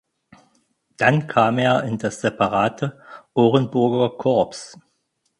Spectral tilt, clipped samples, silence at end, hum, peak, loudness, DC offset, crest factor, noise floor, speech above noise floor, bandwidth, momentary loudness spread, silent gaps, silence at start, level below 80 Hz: -6.5 dB/octave; under 0.1%; 0.7 s; none; -2 dBFS; -20 LUFS; under 0.1%; 20 dB; -71 dBFS; 51 dB; 11.5 kHz; 10 LU; none; 1 s; -58 dBFS